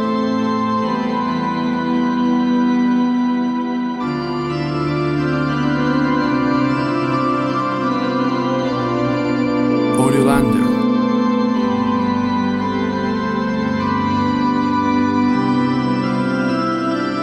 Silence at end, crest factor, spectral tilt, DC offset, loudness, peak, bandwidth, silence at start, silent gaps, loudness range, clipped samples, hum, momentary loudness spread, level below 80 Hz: 0 s; 14 dB; -7 dB/octave; under 0.1%; -18 LUFS; -2 dBFS; 12.5 kHz; 0 s; none; 2 LU; under 0.1%; none; 4 LU; -46 dBFS